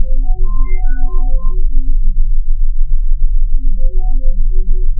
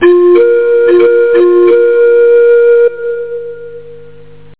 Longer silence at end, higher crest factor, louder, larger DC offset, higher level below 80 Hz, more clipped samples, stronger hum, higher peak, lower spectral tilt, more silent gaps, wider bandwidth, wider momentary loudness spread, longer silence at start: second, 0 s vs 0.6 s; about the same, 8 dB vs 8 dB; second, -20 LUFS vs -7 LUFS; second, under 0.1% vs 2%; first, -8 dBFS vs -52 dBFS; neither; second, none vs 50 Hz at -60 dBFS; about the same, 0 dBFS vs 0 dBFS; second, -8 dB/octave vs -9.5 dB/octave; neither; second, 2.2 kHz vs 4 kHz; second, 1 LU vs 14 LU; about the same, 0 s vs 0 s